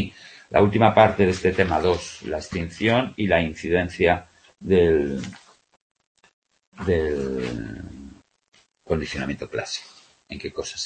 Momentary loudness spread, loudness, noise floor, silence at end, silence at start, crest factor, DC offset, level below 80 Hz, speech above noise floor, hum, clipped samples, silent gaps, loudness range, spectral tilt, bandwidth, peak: 16 LU; -22 LUFS; -45 dBFS; 0 s; 0 s; 22 dB; under 0.1%; -44 dBFS; 24 dB; none; under 0.1%; 5.82-5.95 s, 6.07-6.15 s, 6.33-6.42 s, 6.67-6.72 s; 9 LU; -6 dB/octave; 8.8 kHz; -2 dBFS